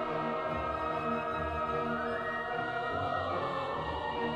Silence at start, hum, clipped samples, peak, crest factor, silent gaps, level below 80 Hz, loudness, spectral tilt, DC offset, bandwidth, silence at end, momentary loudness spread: 0 s; none; under 0.1%; -20 dBFS; 14 dB; none; -52 dBFS; -34 LUFS; -6.5 dB/octave; under 0.1%; 12 kHz; 0 s; 1 LU